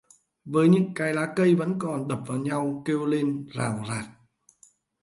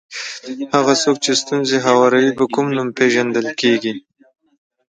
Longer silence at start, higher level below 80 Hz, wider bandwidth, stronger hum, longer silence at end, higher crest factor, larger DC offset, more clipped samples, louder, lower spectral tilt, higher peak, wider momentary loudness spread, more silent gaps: first, 0.45 s vs 0.1 s; about the same, -66 dBFS vs -64 dBFS; first, 11.5 kHz vs 9.6 kHz; neither; about the same, 0.9 s vs 0.95 s; about the same, 18 dB vs 18 dB; neither; neither; second, -26 LUFS vs -16 LUFS; first, -7 dB/octave vs -3.5 dB/octave; second, -8 dBFS vs 0 dBFS; second, 10 LU vs 14 LU; neither